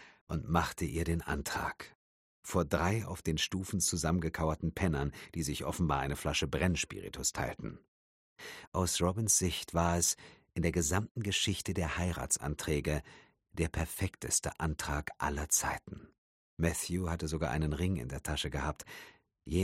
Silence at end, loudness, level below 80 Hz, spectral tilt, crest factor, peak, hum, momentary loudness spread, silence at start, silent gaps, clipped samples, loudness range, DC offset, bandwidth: 0 s; -34 LUFS; -46 dBFS; -4 dB/octave; 24 dB; -12 dBFS; none; 10 LU; 0 s; 0.21-0.27 s, 1.95-2.43 s, 7.88-8.36 s, 8.67-8.72 s, 11.11-11.15 s, 16.18-16.57 s; under 0.1%; 4 LU; under 0.1%; 16 kHz